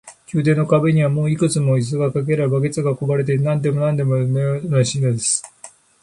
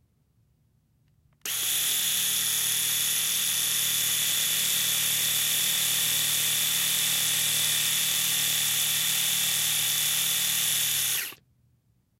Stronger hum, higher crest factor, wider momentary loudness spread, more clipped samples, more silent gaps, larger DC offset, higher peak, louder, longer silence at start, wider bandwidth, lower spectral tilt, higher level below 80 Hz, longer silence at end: neither; about the same, 14 dB vs 18 dB; first, 5 LU vs 1 LU; neither; neither; neither; first, -4 dBFS vs -10 dBFS; first, -18 LUFS vs -23 LUFS; second, 0.05 s vs 1.45 s; second, 11.5 kHz vs 16 kHz; first, -6 dB/octave vs 1.5 dB/octave; first, -56 dBFS vs -74 dBFS; second, 0.35 s vs 0.85 s